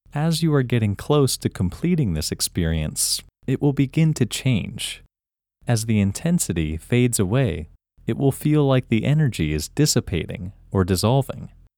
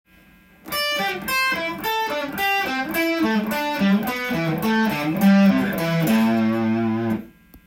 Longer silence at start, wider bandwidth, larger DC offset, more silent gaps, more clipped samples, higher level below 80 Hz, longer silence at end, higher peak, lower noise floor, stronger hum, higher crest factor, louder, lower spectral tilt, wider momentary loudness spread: second, 0.15 s vs 0.65 s; first, 19 kHz vs 17 kHz; neither; neither; neither; first, -40 dBFS vs -54 dBFS; first, 0.3 s vs 0.1 s; about the same, -4 dBFS vs -6 dBFS; first, -90 dBFS vs -52 dBFS; neither; about the same, 18 dB vs 14 dB; about the same, -22 LUFS vs -21 LUFS; about the same, -5.5 dB/octave vs -5.5 dB/octave; first, 10 LU vs 7 LU